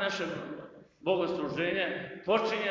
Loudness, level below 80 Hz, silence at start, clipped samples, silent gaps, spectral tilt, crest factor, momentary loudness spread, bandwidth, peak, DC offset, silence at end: -32 LUFS; -68 dBFS; 0 s; under 0.1%; none; -5 dB/octave; 18 dB; 13 LU; 7.6 kHz; -14 dBFS; under 0.1%; 0 s